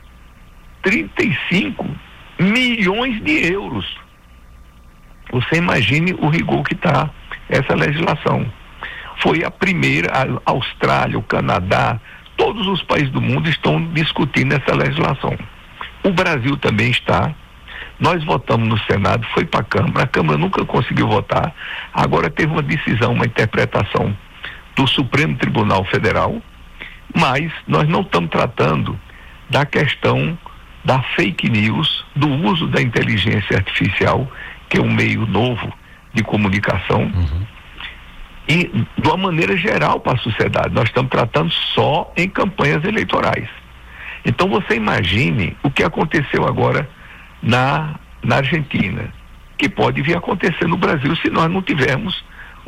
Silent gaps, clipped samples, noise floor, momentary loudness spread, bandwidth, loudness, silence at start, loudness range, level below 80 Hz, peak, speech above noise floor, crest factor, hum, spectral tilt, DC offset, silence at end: none; under 0.1%; -43 dBFS; 11 LU; 14.5 kHz; -17 LUFS; 0.05 s; 2 LU; -38 dBFS; -4 dBFS; 26 dB; 12 dB; none; -6.5 dB/octave; under 0.1%; 0.05 s